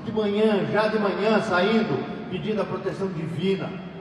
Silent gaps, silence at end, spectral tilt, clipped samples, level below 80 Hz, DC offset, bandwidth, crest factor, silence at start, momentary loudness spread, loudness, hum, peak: none; 0 s; -7 dB/octave; under 0.1%; -58 dBFS; under 0.1%; 11 kHz; 16 dB; 0 s; 8 LU; -24 LUFS; none; -8 dBFS